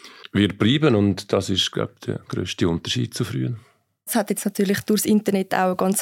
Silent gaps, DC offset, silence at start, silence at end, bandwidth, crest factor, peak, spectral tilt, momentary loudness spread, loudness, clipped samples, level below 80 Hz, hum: none; under 0.1%; 0.05 s; 0 s; 17 kHz; 18 dB; -4 dBFS; -5 dB/octave; 10 LU; -22 LUFS; under 0.1%; -54 dBFS; none